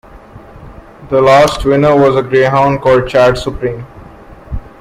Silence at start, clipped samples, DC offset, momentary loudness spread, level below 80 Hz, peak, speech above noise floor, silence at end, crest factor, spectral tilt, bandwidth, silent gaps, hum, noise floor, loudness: 0.15 s; under 0.1%; under 0.1%; 18 LU; -32 dBFS; 0 dBFS; 25 dB; 0.1 s; 12 dB; -6 dB/octave; 15 kHz; none; none; -35 dBFS; -10 LUFS